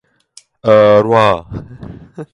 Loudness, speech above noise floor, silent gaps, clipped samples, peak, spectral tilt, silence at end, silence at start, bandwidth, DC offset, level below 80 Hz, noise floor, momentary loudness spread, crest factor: -11 LUFS; 35 dB; none; under 0.1%; 0 dBFS; -7 dB/octave; 0.1 s; 0.65 s; 10.5 kHz; under 0.1%; -44 dBFS; -46 dBFS; 24 LU; 14 dB